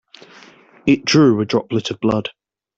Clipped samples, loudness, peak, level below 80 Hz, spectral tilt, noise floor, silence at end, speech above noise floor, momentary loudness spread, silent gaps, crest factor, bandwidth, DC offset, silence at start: under 0.1%; -17 LUFS; -2 dBFS; -54 dBFS; -5.5 dB/octave; -46 dBFS; 0.5 s; 30 dB; 10 LU; none; 16 dB; 8 kHz; under 0.1%; 0.85 s